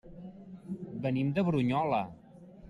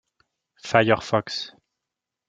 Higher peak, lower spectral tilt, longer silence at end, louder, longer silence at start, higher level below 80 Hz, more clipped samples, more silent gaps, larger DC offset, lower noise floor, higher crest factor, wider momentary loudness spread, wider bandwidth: second, -16 dBFS vs 0 dBFS; first, -9 dB/octave vs -5 dB/octave; second, 0 s vs 0.8 s; second, -31 LUFS vs -22 LUFS; second, 0.05 s vs 0.65 s; about the same, -62 dBFS vs -62 dBFS; neither; neither; neither; second, -52 dBFS vs -86 dBFS; second, 16 dB vs 26 dB; about the same, 20 LU vs 18 LU; first, 11 kHz vs 9.2 kHz